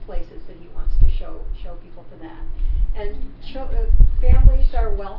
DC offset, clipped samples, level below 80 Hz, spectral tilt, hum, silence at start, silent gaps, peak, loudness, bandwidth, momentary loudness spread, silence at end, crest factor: under 0.1%; 0.2%; -18 dBFS; -10.5 dB/octave; none; 0 s; none; 0 dBFS; -22 LUFS; 4.1 kHz; 23 LU; 0 s; 16 dB